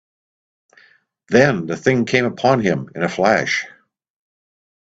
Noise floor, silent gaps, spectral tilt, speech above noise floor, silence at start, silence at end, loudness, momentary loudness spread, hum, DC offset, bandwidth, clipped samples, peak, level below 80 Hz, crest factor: -54 dBFS; none; -5.5 dB/octave; 37 dB; 1.3 s; 1.25 s; -17 LUFS; 7 LU; none; under 0.1%; 8 kHz; under 0.1%; 0 dBFS; -58 dBFS; 20 dB